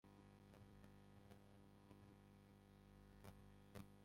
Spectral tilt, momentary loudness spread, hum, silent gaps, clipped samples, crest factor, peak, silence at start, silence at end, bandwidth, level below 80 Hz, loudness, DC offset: -6 dB/octave; 5 LU; none; none; under 0.1%; 22 dB; -42 dBFS; 0.05 s; 0 s; 16 kHz; -74 dBFS; -67 LUFS; under 0.1%